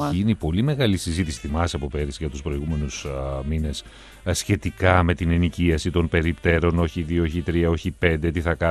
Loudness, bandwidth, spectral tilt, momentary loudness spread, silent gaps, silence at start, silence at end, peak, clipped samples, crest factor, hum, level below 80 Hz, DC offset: -23 LUFS; 13 kHz; -6 dB/octave; 9 LU; none; 0 s; 0 s; -2 dBFS; under 0.1%; 20 dB; none; -36 dBFS; under 0.1%